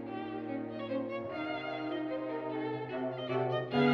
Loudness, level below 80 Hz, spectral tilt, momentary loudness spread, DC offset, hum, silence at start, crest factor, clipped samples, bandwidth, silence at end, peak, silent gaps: -36 LUFS; -74 dBFS; -8 dB/octave; 6 LU; under 0.1%; none; 0 s; 18 dB; under 0.1%; 6.6 kHz; 0 s; -16 dBFS; none